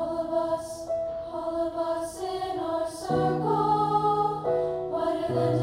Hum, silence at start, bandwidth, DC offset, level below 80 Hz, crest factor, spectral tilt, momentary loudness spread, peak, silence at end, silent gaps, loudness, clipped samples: none; 0 s; 16 kHz; under 0.1%; -56 dBFS; 14 dB; -6.5 dB/octave; 8 LU; -12 dBFS; 0 s; none; -28 LUFS; under 0.1%